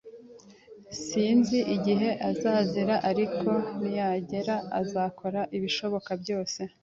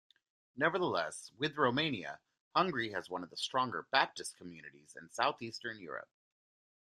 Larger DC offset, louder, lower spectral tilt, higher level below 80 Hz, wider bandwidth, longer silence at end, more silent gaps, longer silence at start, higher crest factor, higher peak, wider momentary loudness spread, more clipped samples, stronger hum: neither; first, -28 LUFS vs -35 LUFS; first, -5.5 dB/octave vs -4 dB/octave; first, -66 dBFS vs -78 dBFS; second, 7.8 kHz vs 13.5 kHz; second, 0.15 s vs 0.9 s; second, none vs 2.40-2.51 s; second, 0.05 s vs 0.55 s; second, 16 dB vs 26 dB; about the same, -12 dBFS vs -12 dBFS; second, 8 LU vs 18 LU; neither; neither